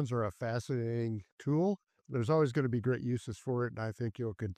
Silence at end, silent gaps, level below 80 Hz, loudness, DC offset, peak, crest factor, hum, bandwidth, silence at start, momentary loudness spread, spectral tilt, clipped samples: 0.05 s; 1.32-1.38 s; -66 dBFS; -34 LUFS; under 0.1%; -18 dBFS; 16 dB; none; 10.5 kHz; 0 s; 9 LU; -8 dB/octave; under 0.1%